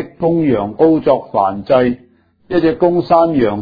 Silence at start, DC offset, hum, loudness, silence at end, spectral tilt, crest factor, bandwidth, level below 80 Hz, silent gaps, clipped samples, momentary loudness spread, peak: 0 s; under 0.1%; none; -14 LUFS; 0 s; -10 dB/octave; 14 dB; 5 kHz; -46 dBFS; none; under 0.1%; 5 LU; 0 dBFS